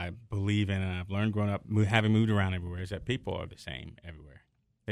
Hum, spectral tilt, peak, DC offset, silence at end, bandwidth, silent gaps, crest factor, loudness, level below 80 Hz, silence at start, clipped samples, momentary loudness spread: none; -7 dB/octave; -6 dBFS; under 0.1%; 0 s; 10.5 kHz; none; 24 dB; -30 LUFS; -54 dBFS; 0 s; under 0.1%; 16 LU